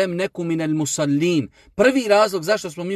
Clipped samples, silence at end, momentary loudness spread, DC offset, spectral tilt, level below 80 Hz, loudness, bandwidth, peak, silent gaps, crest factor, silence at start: under 0.1%; 0 s; 7 LU; under 0.1%; -5 dB/octave; -56 dBFS; -20 LUFS; 15 kHz; -4 dBFS; none; 16 dB; 0 s